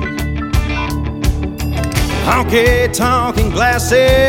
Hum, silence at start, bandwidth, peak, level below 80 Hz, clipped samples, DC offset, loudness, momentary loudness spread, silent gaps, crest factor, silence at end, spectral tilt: none; 0 s; 17 kHz; 0 dBFS; -20 dBFS; under 0.1%; under 0.1%; -15 LUFS; 8 LU; none; 14 dB; 0 s; -5 dB/octave